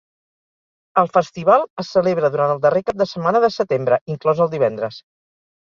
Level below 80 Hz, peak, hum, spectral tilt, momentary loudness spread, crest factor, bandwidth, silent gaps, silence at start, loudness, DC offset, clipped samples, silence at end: -60 dBFS; -2 dBFS; none; -6.5 dB/octave; 5 LU; 18 dB; 7.2 kHz; 1.70-1.77 s, 4.01-4.06 s; 0.95 s; -18 LUFS; under 0.1%; under 0.1%; 0.7 s